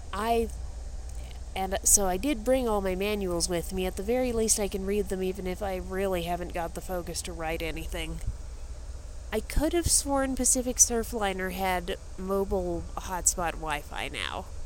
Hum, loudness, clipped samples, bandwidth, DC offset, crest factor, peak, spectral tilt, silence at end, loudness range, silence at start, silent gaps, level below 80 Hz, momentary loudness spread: none; -28 LUFS; under 0.1%; 17 kHz; under 0.1%; 24 dB; -6 dBFS; -3 dB/octave; 0 s; 7 LU; 0 s; none; -38 dBFS; 17 LU